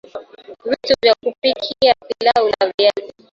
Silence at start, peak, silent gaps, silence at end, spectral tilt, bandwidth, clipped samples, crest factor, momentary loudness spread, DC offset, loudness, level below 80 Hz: 0.15 s; 0 dBFS; 2.74-2.78 s; 0.25 s; -3.5 dB/octave; 7.6 kHz; under 0.1%; 18 dB; 15 LU; under 0.1%; -16 LUFS; -54 dBFS